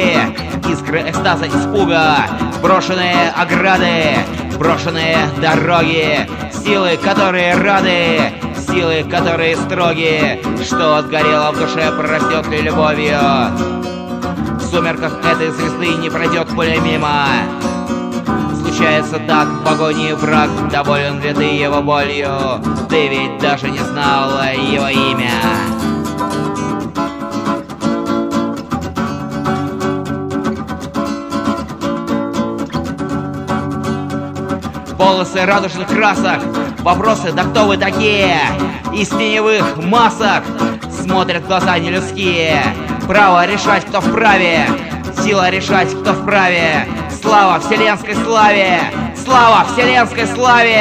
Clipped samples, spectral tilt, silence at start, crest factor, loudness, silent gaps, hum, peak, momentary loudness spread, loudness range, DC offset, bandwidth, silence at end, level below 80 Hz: under 0.1%; -5 dB/octave; 0 s; 14 dB; -14 LUFS; none; none; 0 dBFS; 9 LU; 7 LU; under 0.1%; 15.5 kHz; 0 s; -36 dBFS